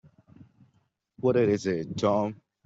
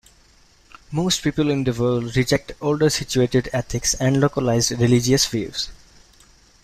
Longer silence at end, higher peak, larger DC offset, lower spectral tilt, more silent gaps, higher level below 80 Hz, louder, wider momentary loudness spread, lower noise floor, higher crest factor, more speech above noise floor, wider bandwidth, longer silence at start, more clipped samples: second, 0.3 s vs 0.9 s; second, -12 dBFS vs -4 dBFS; neither; first, -7 dB/octave vs -4.5 dB/octave; neither; second, -64 dBFS vs -42 dBFS; second, -27 LUFS vs -20 LUFS; about the same, 6 LU vs 7 LU; first, -70 dBFS vs -54 dBFS; about the same, 18 dB vs 18 dB; first, 45 dB vs 34 dB; second, 8 kHz vs 16 kHz; first, 1.25 s vs 0.9 s; neither